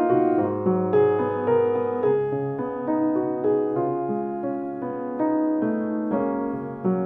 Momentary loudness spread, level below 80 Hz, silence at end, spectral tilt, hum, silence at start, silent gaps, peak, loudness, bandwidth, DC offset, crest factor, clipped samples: 8 LU; -66 dBFS; 0 s; -11.5 dB/octave; none; 0 s; none; -8 dBFS; -24 LUFS; 3.6 kHz; under 0.1%; 14 dB; under 0.1%